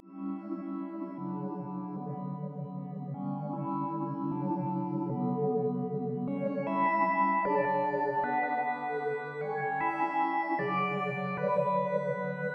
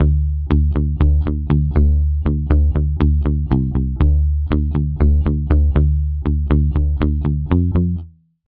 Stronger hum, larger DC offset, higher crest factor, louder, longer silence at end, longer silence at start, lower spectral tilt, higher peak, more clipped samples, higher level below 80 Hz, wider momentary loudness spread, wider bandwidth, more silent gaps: neither; neither; about the same, 16 dB vs 16 dB; second, -32 LUFS vs -18 LUFS; second, 0 s vs 0.4 s; about the same, 0.05 s vs 0 s; second, -9.5 dB/octave vs -12 dB/octave; second, -16 dBFS vs 0 dBFS; neither; second, -78 dBFS vs -18 dBFS; first, 10 LU vs 4 LU; first, 5.6 kHz vs 3.7 kHz; neither